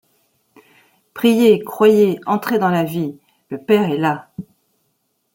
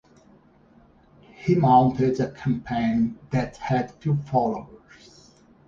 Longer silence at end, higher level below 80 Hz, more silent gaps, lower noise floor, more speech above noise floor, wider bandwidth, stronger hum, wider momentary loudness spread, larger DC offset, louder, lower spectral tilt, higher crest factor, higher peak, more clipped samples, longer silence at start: about the same, 0.95 s vs 0.9 s; second, -64 dBFS vs -52 dBFS; neither; first, -68 dBFS vs -55 dBFS; first, 52 dB vs 33 dB; first, 17 kHz vs 7.4 kHz; neither; first, 19 LU vs 10 LU; neither; first, -16 LUFS vs -23 LUFS; second, -6.5 dB/octave vs -8.5 dB/octave; about the same, 16 dB vs 20 dB; first, -2 dBFS vs -6 dBFS; neither; second, 1.15 s vs 1.4 s